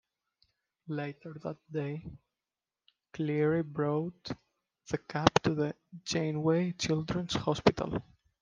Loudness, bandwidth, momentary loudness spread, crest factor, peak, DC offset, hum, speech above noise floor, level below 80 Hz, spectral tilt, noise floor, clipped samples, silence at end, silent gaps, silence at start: -32 LUFS; 9.8 kHz; 15 LU; 32 dB; -2 dBFS; under 0.1%; none; over 58 dB; -60 dBFS; -5.5 dB/octave; under -90 dBFS; under 0.1%; 0.4 s; none; 0.85 s